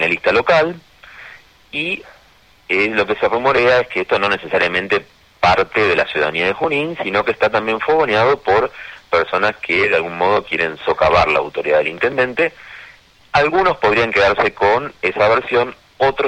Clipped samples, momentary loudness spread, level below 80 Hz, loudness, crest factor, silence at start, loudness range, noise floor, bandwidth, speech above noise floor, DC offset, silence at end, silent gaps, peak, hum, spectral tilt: under 0.1%; 7 LU; -46 dBFS; -16 LUFS; 16 dB; 0 s; 2 LU; -50 dBFS; 9.4 kHz; 34 dB; under 0.1%; 0 s; none; -2 dBFS; none; -5 dB/octave